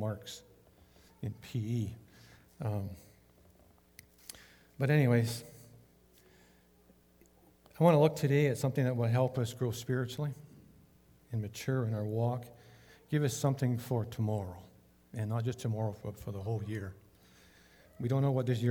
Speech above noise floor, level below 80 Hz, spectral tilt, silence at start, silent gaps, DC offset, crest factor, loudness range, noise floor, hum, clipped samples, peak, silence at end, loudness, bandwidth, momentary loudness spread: 32 dB; -68 dBFS; -7 dB/octave; 0 s; none; under 0.1%; 22 dB; 11 LU; -64 dBFS; none; under 0.1%; -12 dBFS; 0 s; -33 LUFS; 19 kHz; 19 LU